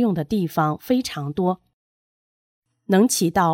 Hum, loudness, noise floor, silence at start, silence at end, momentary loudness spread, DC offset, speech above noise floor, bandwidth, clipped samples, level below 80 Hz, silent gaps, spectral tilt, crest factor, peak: none; -21 LUFS; under -90 dBFS; 0 s; 0 s; 7 LU; under 0.1%; over 70 dB; 17 kHz; under 0.1%; -56 dBFS; 1.73-2.62 s; -5 dB/octave; 18 dB; -6 dBFS